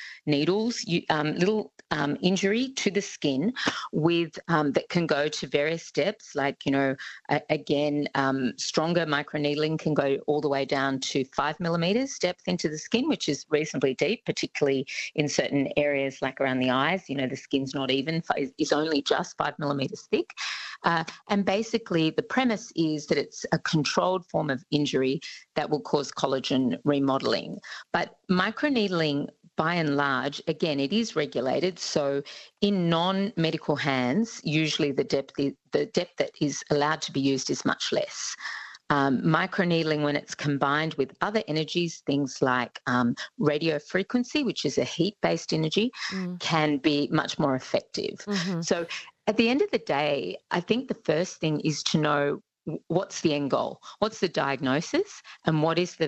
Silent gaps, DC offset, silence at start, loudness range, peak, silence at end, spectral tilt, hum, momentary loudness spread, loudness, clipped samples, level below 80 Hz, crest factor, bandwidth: none; under 0.1%; 0 s; 1 LU; -8 dBFS; 0 s; -5 dB/octave; none; 5 LU; -27 LUFS; under 0.1%; -64 dBFS; 20 dB; 8.4 kHz